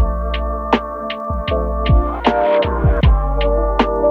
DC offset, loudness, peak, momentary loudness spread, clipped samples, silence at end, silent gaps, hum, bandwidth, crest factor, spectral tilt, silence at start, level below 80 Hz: under 0.1%; -17 LUFS; -2 dBFS; 7 LU; under 0.1%; 0 s; none; none; 5.6 kHz; 14 dB; -8.5 dB/octave; 0 s; -20 dBFS